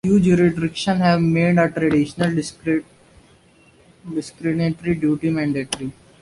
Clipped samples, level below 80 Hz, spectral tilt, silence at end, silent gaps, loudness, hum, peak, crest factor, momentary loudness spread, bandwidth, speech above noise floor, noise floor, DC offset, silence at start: under 0.1%; -50 dBFS; -6.5 dB/octave; 0.3 s; none; -20 LUFS; none; -2 dBFS; 18 dB; 11 LU; 11.5 kHz; 34 dB; -53 dBFS; under 0.1%; 0.05 s